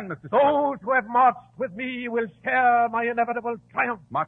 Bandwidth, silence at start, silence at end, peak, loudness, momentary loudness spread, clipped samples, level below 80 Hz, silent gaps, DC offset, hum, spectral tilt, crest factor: 4 kHz; 0 s; 0 s; -8 dBFS; -23 LUFS; 10 LU; under 0.1%; -66 dBFS; none; under 0.1%; none; -8 dB/octave; 16 dB